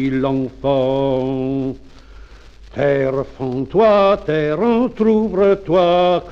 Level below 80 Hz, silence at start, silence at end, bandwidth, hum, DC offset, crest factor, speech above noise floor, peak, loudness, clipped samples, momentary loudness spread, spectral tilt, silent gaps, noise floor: -42 dBFS; 0 s; 0 s; 7.2 kHz; none; under 0.1%; 14 dB; 24 dB; -4 dBFS; -17 LUFS; under 0.1%; 10 LU; -8 dB/octave; none; -40 dBFS